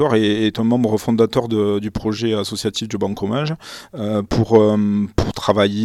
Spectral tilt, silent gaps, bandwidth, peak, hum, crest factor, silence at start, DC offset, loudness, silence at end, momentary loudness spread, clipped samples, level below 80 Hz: -6 dB/octave; none; 13.5 kHz; 0 dBFS; none; 18 dB; 0 s; under 0.1%; -18 LUFS; 0 s; 8 LU; under 0.1%; -40 dBFS